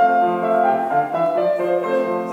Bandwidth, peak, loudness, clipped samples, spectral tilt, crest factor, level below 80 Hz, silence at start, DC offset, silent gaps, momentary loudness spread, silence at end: 8.2 kHz; -6 dBFS; -19 LUFS; under 0.1%; -7 dB/octave; 12 dB; -76 dBFS; 0 s; under 0.1%; none; 3 LU; 0 s